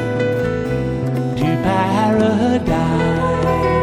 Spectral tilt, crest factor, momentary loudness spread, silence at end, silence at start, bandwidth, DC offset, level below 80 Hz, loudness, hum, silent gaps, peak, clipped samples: -7.5 dB/octave; 12 dB; 5 LU; 0 s; 0 s; 14.5 kHz; under 0.1%; -34 dBFS; -17 LUFS; none; none; -4 dBFS; under 0.1%